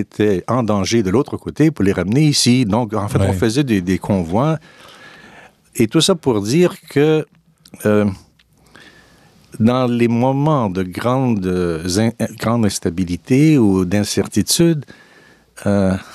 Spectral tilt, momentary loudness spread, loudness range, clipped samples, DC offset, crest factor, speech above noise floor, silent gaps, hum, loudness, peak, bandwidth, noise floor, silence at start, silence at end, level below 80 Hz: -5.5 dB/octave; 7 LU; 3 LU; under 0.1%; under 0.1%; 14 dB; 34 dB; none; none; -16 LUFS; -2 dBFS; 14.5 kHz; -50 dBFS; 0 s; 0 s; -48 dBFS